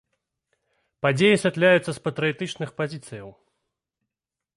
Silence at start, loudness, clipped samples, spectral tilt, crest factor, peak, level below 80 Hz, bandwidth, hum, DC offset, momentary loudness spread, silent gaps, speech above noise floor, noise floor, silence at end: 1.05 s; -22 LUFS; under 0.1%; -5.5 dB/octave; 18 dB; -8 dBFS; -66 dBFS; 11.5 kHz; none; under 0.1%; 16 LU; none; 65 dB; -88 dBFS; 1.25 s